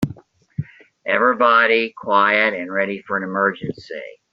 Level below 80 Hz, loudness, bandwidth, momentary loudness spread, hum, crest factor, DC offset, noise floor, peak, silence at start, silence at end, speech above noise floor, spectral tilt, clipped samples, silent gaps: -58 dBFS; -17 LUFS; 8 kHz; 18 LU; none; 20 dB; under 0.1%; -41 dBFS; 0 dBFS; 0 s; 0.2 s; 22 dB; -2.5 dB/octave; under 0.1%; none